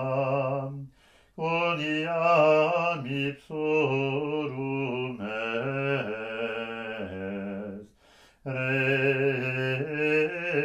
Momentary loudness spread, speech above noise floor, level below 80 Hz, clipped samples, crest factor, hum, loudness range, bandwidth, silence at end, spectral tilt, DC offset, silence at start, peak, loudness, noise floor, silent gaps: 12 LU; 31 dB; -66 dBFS; under 0.1%; 16 dB; none; 7 LU; 12.5 kHz; 0 s; -7 dB/octave; under 0.1%; 0 s; -12 dBFS; -27 LUFS; -59 dBFS; none